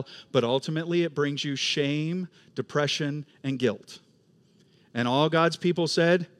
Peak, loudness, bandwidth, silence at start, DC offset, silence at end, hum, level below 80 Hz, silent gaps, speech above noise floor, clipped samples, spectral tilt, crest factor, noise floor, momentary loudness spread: -8 dBFS; -26 LUFS; 12.5 kHz; 0 s; under 0.1%; 0.15 s; none; -78 dBFS; none; 35 dB; under 0.1%; -5 dB/octave; 20 dB; -62 dBFS; 11 LU